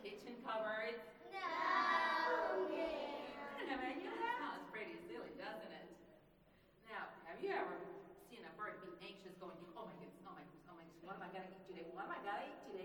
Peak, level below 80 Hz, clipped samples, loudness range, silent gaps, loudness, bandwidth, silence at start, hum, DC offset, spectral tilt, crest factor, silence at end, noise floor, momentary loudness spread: -26 dBFS; -80 dBFS; under 0.1%; 13 LU; none; -44 LUFS; 19.5 kHz; 0 s; none; under 0.1%; -4.5 dB/octave; 20 dB; 0 s; -70 dBFS; 19 LU